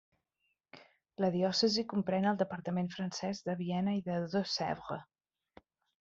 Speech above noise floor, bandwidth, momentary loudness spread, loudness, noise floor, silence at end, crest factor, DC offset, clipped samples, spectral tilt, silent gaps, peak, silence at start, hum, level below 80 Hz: 48 dB; 7.6 kHz; 8 LU; -34 LUFS; -82 dBFS; 0.95 s; 18 dB; under 0.1%; under 0.1%; -5.5 dB/octave; none; -18 dBFS; 0.75 s; none; -74 dBFS